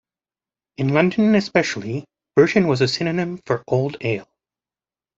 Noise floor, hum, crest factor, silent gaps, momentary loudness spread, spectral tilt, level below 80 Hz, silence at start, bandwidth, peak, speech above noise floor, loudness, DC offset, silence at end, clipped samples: under -90 dBFS; none; 20 dB; none; 10 LU; -6 dB/octave; -60 dBFS; 0.8 s; 7.8 kHz; -2 dBFS; over 71 dB; -20 LUFS; under 0.1%; 0.95 s; under 0.1%